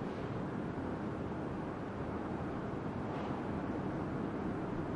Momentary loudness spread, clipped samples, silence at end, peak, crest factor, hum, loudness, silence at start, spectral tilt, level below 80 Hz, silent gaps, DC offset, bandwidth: 2 LU; under 0.1%; 0 s; -26 dBFS; 14 dB; none; -40 LUFS; 0 s; -8.5 dB/octave; -56 dBFS; none; under 0.1%; 11 kHz